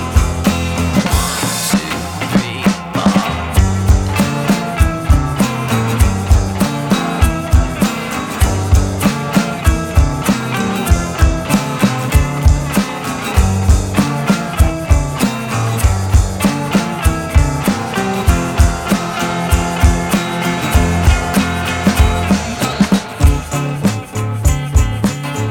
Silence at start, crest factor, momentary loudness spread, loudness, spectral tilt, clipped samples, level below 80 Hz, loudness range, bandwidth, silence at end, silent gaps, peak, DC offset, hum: 0 s; 14 dB; 4 LU; -15 LUFS; -5.5 dB/octave; under 0.1%; -18 dBFS; 1 LU; 19 kHz; 0 s; none; 0 dBFS; under 0.1%; none